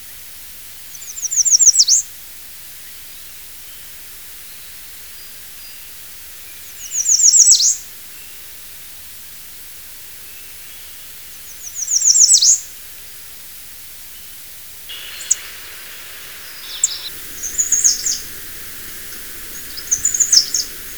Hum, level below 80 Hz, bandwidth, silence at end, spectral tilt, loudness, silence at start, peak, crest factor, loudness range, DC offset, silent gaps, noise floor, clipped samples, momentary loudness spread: none; -50 dBFS; over 20 kHz; 0 s; 3 dB/octave; -12 LUFS; 0 s; 0 dBFS; 20 dB; 18 LU; 0.4%; none; -35 dBFS; under 0.1%; 24 LU